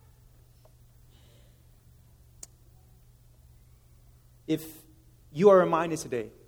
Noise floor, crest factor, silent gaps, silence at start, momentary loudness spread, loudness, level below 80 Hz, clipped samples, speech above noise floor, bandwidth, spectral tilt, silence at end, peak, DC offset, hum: -57 dBFS; 24 dB; none; 4.5 s; 29 LU; -25 LUFS; -60 dBFS; under 0.1%; 33 dB; over 20 kHz; -6 dB/octave; 0.2 s; -6 dBFS; under 0.1%; none